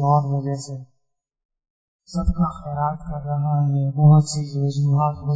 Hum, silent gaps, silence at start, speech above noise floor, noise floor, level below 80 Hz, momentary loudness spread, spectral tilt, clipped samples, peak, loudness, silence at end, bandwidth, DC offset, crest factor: none; 1.45-1.49 s, 1.70-1.99 s; 0 s; 53 dB; -73 dBFS; -38 dBFS; 15 LU; -8 dB/octave; under 0.1%; -6 dBFS; -21 LUFS; 0 s; 8 kHz; under 0.1%; 16 dB